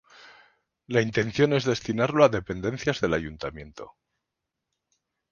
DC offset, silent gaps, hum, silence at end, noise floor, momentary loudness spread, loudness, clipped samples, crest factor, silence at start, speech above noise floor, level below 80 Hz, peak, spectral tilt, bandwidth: under 0.1%; none; none; 1.45 s; -84 dBFS; 15 LU; -25 LUFS; under 0.1%; 22 dB; 0.9 s; 59 dB; -52 dBFS; -4 dBFS; -6 dB/octave; 7.2 kHz